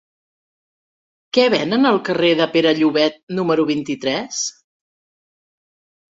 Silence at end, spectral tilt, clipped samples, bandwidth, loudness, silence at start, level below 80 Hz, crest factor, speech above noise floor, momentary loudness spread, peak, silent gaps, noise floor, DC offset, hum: 1.6 s; -4 dB/octave; under 0.1%; 7.8 kHz; -18 LUFS; 1.35 s; -64 dBFS; 18 dB; over 73 dB; 7 LU; -2 dBFS; 3.23-3.27 s; under -90 dBFS; under 0.1%; none